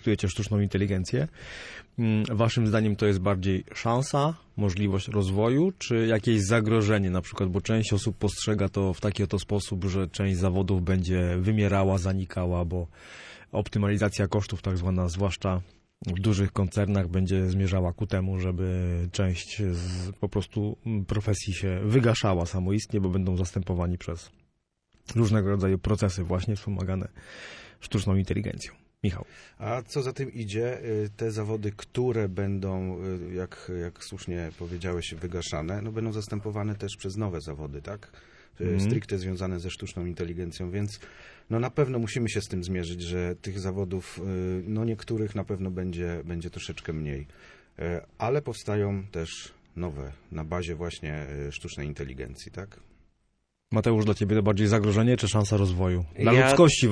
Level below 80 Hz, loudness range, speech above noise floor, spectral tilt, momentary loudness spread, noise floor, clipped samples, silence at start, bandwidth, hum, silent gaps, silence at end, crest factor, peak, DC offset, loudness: -46 dBFS; 8 LU; 47 dB; -6.5 dB/octave; 12 LU; -74 dBFS; under 0.1%; 0 s; 11 kHz; none; none; 0 s; 22 dB; -6 dBFS; under 0.1%; -28 LUFS